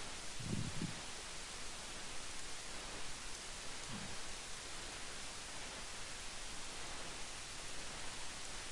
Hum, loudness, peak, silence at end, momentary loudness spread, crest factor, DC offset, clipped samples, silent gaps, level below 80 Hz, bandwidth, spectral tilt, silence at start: none; -46 LUFS; -28 dBFS; 0 s; 3 LU; 18 dB; under 0.1%; under 0.1%; none; -56 dBFS; 11.5 kHz; -2 dB/octave; 0 s